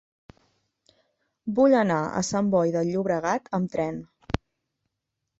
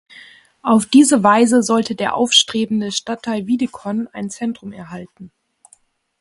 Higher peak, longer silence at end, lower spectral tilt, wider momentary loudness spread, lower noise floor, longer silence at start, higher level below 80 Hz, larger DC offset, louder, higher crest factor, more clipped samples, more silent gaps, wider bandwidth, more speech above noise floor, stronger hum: second, -4 dBFS vs 0 dBFS; about the same, 1.05 s vs 0.95 s; first, -6 dB/octave vs -3.5 dB/octave; second, 14 LU vs 17 LU; first, -82 dBFS vs -55 dBFS; first, 1.45 s vs 0.65 s; first, -50 dBFS vs -60 dBFS; neither; second, -25 LUFS vs -16 LUFS; about the same, 22 dB vs 18 dB; neither; neither; second, 8.2 kHz vs 11.5 kHz; first, 59 dB vs 39 dB; neither